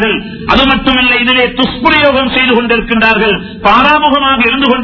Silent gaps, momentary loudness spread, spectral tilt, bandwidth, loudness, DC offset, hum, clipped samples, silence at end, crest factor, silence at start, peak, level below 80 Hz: none; 5 LU; -6 dB/octave; 6 kHz; -8 LUFS; under 0.1%; none; 0.7%; 0 s; 10 dB; 0 s; 0 dBFS; -30 dBFS